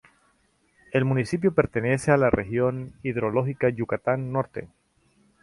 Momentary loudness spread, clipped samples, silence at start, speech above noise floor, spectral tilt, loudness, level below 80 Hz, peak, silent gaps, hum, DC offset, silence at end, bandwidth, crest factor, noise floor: 8 LU; under 0.1%; 0.9 s; 42 dB; -7.5 dB/octave; -25 LUFS; -50 dBFS; -6 dBFS; none; none; under 0.1%; 0.75 s; 11.5 kHz; 20 dB; -66 dBFS